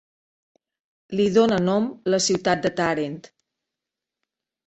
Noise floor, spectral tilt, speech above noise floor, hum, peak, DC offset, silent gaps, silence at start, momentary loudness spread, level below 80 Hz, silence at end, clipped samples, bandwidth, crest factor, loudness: -87 dBFS; -4.5 dB/octave; 65 dB; none; -6 dBFS; under 0.1%; none; 1.1 s; 11 LU; -60 dBFS; 1.45 s; under 0.1%; 8.4 kHz; 18 dB; -22 LUFS